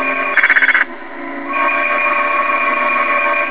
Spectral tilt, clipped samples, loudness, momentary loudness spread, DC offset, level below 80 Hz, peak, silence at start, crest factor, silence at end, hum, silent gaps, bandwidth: -5 dB/octave; under 0.1%; -13 LUFS; 11 LU; 2%; -66 dBFS; 0 dBFS; 0 s; 14 dB; 0 s; none; none; 4 kHz